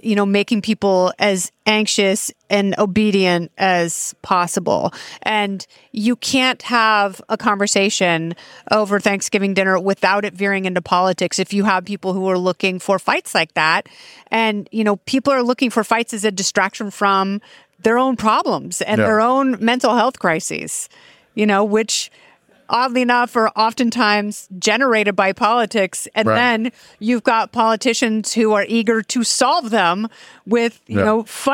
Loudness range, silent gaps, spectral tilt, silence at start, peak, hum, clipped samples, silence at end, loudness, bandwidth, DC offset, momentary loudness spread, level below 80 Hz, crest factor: 2 LU; none; -3.5 dB/octave; 0.05 s; 0 dBFS; none; under 0.1%; 0 s; -17 LUFS; 17 kHz; under 0.1%; 6 LU; -62 dBFS; 16 dB